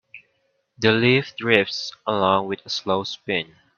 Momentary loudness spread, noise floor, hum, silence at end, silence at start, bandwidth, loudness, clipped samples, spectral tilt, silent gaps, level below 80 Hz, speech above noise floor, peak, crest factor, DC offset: 9 LU; -69 dBFS; none; 0.35 s; 0.15 s; 7.2 kHz; -21 LUFS; under 0.1%; -5 dB/octave; none; -60 dBFS; 48 dB; 0 dBFS; 22 dB; under 0.1%